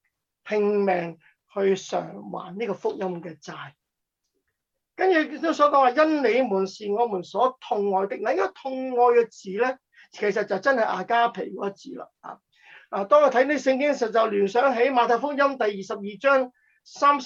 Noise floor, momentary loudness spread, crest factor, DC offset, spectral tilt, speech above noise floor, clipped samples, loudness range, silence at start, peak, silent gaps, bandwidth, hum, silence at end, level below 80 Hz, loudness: -81 dBFS; 17 LU; 18 dB; under 0.1%; -5 dB/octave; 58 dB; under 0.1%; 7 LU; 0.45 s; -6 dBFS; none; 7.8 kHz; none; 0 s; -76 dBFS; -23 LUFS